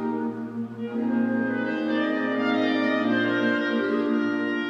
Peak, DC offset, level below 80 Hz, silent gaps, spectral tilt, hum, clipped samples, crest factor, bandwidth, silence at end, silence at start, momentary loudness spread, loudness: -12 dBFS; under 0.1%; -74 dBFS; none; -6.5 dB/octave; none; under 0.1%; 14 dB; 6.8 kHz; 0 s; 0 s; 8 LU; -25 LUFS